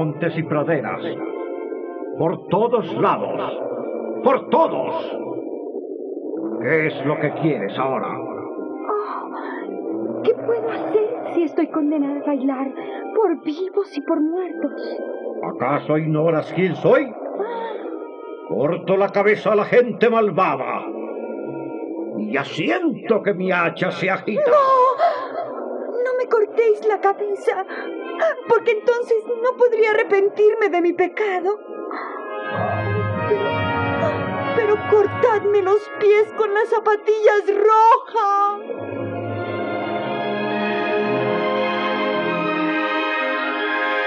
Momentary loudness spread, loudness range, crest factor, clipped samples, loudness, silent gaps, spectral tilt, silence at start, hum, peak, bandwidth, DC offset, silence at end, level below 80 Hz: 12 LU; 5 LU; 16 dB; under 0.1%; -20 LUFS; none; -7 dB/octave; 0 s; none; -4 dBFS; 7.4 kHz; under 0.1%; 0 s; -66 dBFS